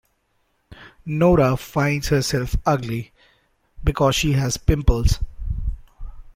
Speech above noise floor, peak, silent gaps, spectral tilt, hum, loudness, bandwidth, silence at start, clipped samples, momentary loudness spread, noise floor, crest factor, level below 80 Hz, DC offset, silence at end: 48 dB; -2 dBFS; none; -5.5 dB/octave; none; -21 LUFS; 16.5 kHz; 0.7 s; under 0.1%; 13 LU; -67 dBFS; 20 dB; -28 dBFS; under 0.1%; 0.15 s